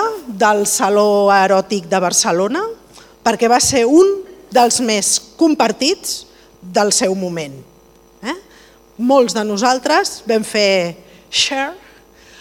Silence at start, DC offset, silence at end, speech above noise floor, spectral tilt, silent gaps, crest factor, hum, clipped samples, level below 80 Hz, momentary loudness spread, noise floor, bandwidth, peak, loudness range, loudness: 0 s; under 0.1%; 0.65 s; 33 dB; -2.5 dB/octave; none; 14 dB; none; under 0.1%; -54 dBFS; 13 LU; -47 dBFS; 19.5 kHz; -2 dBFS; 5 LU; -15 LUFS